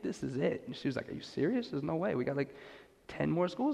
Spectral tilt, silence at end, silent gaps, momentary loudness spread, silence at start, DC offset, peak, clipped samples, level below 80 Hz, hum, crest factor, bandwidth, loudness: -7 dB/octave; 0 s; none; 15 LU; 0 s; under 0.1%; -20 dBFS; under 0.1%; -66 dBFS; none; 16 dB; 11.5 kHz; -35 LUFS